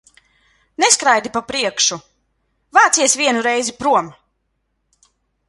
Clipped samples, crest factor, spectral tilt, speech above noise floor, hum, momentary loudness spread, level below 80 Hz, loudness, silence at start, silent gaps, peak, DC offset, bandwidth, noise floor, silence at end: under 0.1%; 18 dB; -0.5 dB/octave; 54 dB; none; 10 LU; -60 dBFS; -15 LUFS; 0.8 s; none; 0 dBFS; under 0.1%; 11.5 kHz; -70 dBFS; 1.4 s